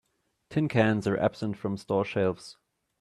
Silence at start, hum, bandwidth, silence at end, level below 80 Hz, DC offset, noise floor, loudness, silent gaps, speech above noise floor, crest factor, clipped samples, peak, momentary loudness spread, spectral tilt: 0.5 s; none; 12 kHz; 0.5 s; -62 dBFS; under 0.1%; -60 dBFS; -28 LUFS; none; 33 dB; 20 dB; under 0.1%; -10 dBFS; 9 LU; -7.5 dB/octave